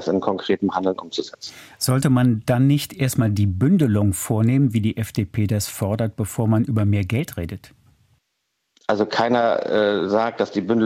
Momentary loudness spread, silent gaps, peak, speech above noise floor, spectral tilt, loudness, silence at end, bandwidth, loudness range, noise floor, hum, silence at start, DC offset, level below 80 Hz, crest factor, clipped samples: 10 LU; none; -6 dBFS; 54 dB; -6.5 dB/octave; -21 LUFS; 0 s; 16.5 kHz; 4 LU; -74 dBFS; none; 0 s; under 0.1%; -50 dBFS; 14 dB; under 0.1%